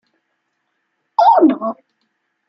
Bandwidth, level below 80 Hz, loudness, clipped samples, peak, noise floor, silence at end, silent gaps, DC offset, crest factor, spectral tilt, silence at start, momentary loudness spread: 6 kHz; -66 dBFS; -14 LUFS; under 0.1%; -2 dBFS; -71 dBFS; 0.75 s; none; under 0.1%; 16 dB; -7 dB/octave; 1.2 s; 16 LU